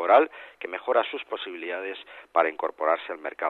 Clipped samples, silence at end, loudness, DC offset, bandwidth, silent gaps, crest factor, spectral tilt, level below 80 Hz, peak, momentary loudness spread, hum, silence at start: under 0.1%; 0 s; -27 LUFS; under 0.1%; 4.3 kHz; none; 20 dB; -4 dB/octave; -78 dBFS; -6 dBFS; 13 LU; none; 0 s